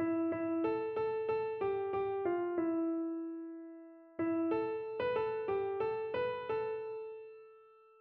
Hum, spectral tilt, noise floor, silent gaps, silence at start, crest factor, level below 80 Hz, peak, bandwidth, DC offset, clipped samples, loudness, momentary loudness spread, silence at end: none; -5 dB/octave; -61 dBFS; none; 0 s; 14 dB; -72 dBFS; -24 dBFS; 4.8 kHz; under 0.1%; under 0.1%; -36 LUFS; 13 LU; 0.35 s